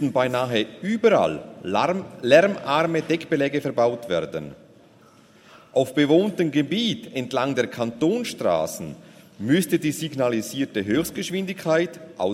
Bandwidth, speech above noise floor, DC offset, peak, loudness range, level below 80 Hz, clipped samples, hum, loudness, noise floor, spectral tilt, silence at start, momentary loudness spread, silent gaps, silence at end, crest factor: 16 kHz; 30 dB; under 0.1%; -2 dBFS; 4 LU; -62 dBFS; under 0.1%; none; -23 LUFS; -53 dBFS; -5.5 dB/octave; 0 s; 10 LU; none; 0 s; 20 dB